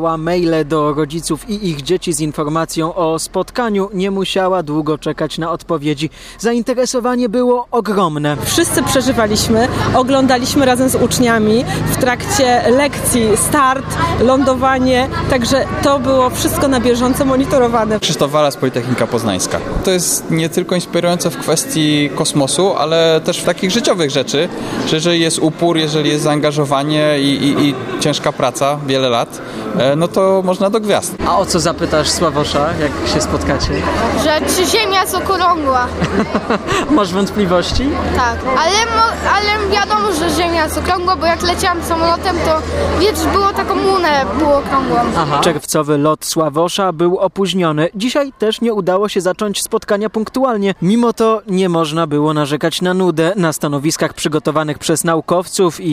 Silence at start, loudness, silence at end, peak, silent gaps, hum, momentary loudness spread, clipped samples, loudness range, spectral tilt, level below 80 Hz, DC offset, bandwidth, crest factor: 0 s; -14 LUFS; 0 s; 0 dBFS; none; none; 5 LU; under 0.1%; 3 LU; -4.5 dB/octave; -34 dBFS; under 0.1%; 15.5 kHz; 14 dB